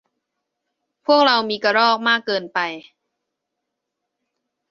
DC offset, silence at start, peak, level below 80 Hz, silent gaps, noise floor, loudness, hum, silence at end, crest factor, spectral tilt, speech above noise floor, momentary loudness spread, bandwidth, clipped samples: under 0.1%; 1.1 s; -2 dBFS; -70 dBFS; none; -80 dBFS; -18 LUFS; none; 1.9 s; 20 dB; -3.5 dB/octave; 62 dB; 12 LU; 7.2 kHz; under 0.1%